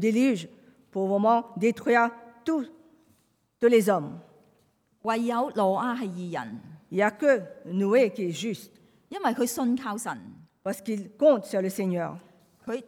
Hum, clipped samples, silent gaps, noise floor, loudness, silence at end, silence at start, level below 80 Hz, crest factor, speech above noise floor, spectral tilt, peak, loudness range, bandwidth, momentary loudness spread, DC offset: none; under 0.1%; none; -68 dBFS; -26 LUFS; 0.05 s; 0 s; -78 dBFS; 18 dB; 42 dB; -5.5 dB/octave; -10 dBFS; 3 LU; 17.5 kHz; 15 LU; under 0.1%